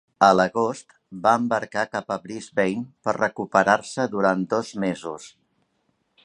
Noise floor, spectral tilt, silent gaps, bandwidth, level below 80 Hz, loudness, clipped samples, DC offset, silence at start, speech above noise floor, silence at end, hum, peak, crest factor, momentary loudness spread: -71 dBFS; -5 dB/octave; none; 11 kHz; -64 dBFS; -23 LUFS; under 0.1%; under 0.1%; 0.2 s; 48 dB; 0.95 s; none; -2 dBFS; 22 dB; 12 LU